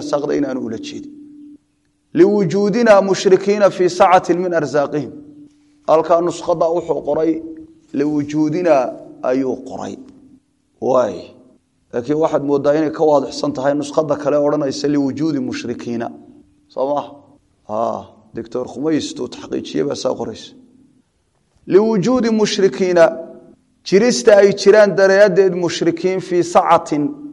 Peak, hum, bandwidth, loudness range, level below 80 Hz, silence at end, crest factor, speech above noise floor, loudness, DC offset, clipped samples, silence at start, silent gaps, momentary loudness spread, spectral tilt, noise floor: 0 dBFS; none; 11 kHz; 11 LU; -58 dBFS; 0 s; 16 dB; 48 dB; -16 LUFS; under 0.1%; under 0.1%; 0 s; none; 17 LU; -5.5 dB/octave; -63 dBFS